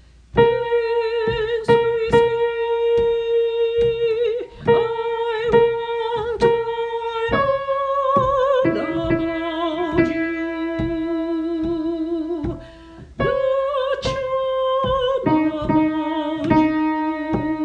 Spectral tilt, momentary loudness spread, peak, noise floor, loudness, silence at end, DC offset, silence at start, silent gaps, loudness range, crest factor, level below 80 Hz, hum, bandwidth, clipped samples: -7 dB/octave; 7 LU; -2 dBFS; -41 dBFS; -20 LUFS; 0 s; under 0.1%; 0.35 s; none; 4 LU; 18 dB; -42 dBFS; none; 9 kHz; under 0.1%